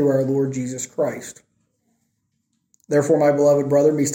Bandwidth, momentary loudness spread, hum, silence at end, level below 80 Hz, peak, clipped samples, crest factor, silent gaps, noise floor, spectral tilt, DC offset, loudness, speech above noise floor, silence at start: 16.5 kHz; 11 LU; none; 0 s; -66 dBFS; -6 dBFS; under 0.1%; 14 dB; none; -71 dBFS; -6.5 dB/octave; under 0.1%; -19 LUFS; 53 dB; 0 s